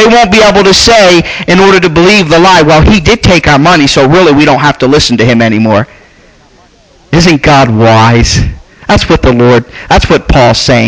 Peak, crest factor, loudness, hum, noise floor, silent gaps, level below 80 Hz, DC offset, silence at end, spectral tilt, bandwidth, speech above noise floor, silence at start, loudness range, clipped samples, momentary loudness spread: 0 dBFS; 4 dB; -4 LUFS; none; -40 dBFS; none; -20 dBFS; under 0.1%; 0 s; -5 dB/octave; 8 kHz; 36 dB; 0 s; 4 LU; 0.3%; 6 LU